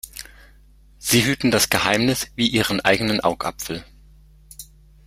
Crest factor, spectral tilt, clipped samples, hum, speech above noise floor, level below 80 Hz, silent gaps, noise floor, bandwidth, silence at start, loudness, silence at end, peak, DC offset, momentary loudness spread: 22 dB; -3.5 dB/octave; under 0.1%; none; 30 dB; -46 dBFS; none; -50 dBFS; 16.5 kHz; 0.05 s; -19 LUFS; 0.45 s; -2 dBFS; under 0.1%; 20 LU